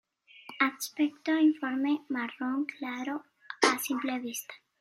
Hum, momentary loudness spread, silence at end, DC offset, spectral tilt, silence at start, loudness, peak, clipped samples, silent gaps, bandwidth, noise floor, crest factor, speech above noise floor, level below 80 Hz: none; 14 LU; 0.25 s; under 0.1%; -2 dB/octave; 0.35 s; -30 LUFS; -6 dBFS; under 0.1%; none; 16 kHz; -52 dBFS; 24 dB; 21 dB; -86 dBFS